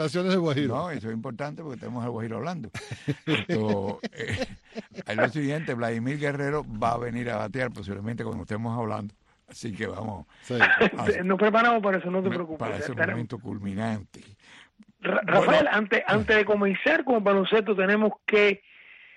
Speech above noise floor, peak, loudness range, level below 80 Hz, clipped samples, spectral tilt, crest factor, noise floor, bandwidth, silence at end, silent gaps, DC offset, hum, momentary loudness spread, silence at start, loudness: 28 dB; -8 dBFS; 8 LU; -56 dBFS; under 0.1%; -6 dB/octave; 18 dB; -54 dBFS; 11.5 kHz; 0.2 s; none; under 0.1%; none; 14 LU; 0 s; -26 LUFS